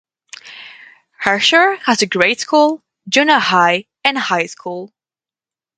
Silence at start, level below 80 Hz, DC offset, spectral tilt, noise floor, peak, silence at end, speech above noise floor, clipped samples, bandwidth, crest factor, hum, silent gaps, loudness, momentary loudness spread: 0.45 s; -64 dBFS; under 0.1%; -2.5 dB/octave; under -90 dBFS; 0 dBFS; 0.9 s; over 76 dB; under 0.1%; 9.8 kHz; 16 dB; none; none; -14 LUFS; 18 LU